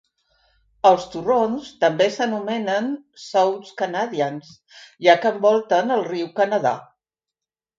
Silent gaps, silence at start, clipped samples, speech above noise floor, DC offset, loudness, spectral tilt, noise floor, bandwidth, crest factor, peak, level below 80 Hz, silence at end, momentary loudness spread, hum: none; 0.85 s; under 0.1%; 67 dB; under 0.1%; -20 LUFS; -5 dB/octave; -87 dBFS; 7.8 kHz; 20 dB; 0 dBFS; -66 dBFS; 0.95 s; 9 LU; none